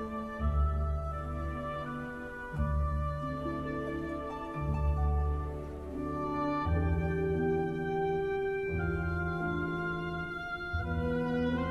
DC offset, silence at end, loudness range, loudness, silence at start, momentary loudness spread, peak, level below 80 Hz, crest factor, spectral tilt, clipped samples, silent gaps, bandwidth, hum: under 0.1%; 0 s; 4 LU; -34 LUFS; 0 s; 7 LU; -20 dBFS; -38 dBFS; 14 dB; -8.5 dB/octave; under 0.1%; none; 6.6 kHz; none